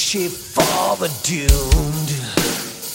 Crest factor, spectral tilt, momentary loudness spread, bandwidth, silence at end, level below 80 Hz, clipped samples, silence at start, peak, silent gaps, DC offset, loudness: 18 dB; -3.5 dB/octave; 5 LU; 16.5 kHz; 0 s; -24 dBFS; under 0.1%; 0 s; 0 dBFS; none; under 0.1%; -19 LUFS